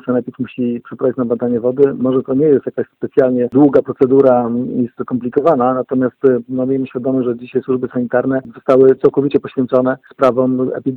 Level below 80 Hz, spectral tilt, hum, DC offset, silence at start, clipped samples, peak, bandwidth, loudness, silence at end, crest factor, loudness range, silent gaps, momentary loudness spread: -56 dBFS; -10 dB/octave; none; under 0.1%; 0.05 s; under 0.1%; 0 dBFS; 4.5 kHz; -15 LUFS; 0 s; 14 dB; 3 LU; none; 9 LU